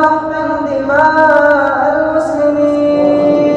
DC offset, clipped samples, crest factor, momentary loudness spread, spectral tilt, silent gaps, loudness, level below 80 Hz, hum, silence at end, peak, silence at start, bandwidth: under 0.1%; under 0.1%; 10 dB; 7 LU; -6.5 dB/octave; none; -11 LUFS; -44 dBFS; none; 0 s; 0 dBFS; 0 s; 8.6 kHz